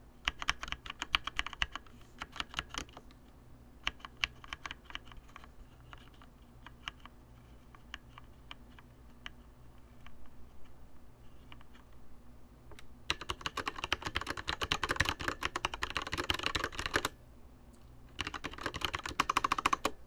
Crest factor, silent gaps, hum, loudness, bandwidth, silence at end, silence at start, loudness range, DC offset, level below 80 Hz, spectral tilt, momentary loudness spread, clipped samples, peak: 32 dB; none; none; -37 LUFS; over 20 kHz; 0 s; 0 s; 20 LU; under 0.1%; -52 dBFS; -2.5 dB/octave; 25 LU; under 0.1%; -8 dBFS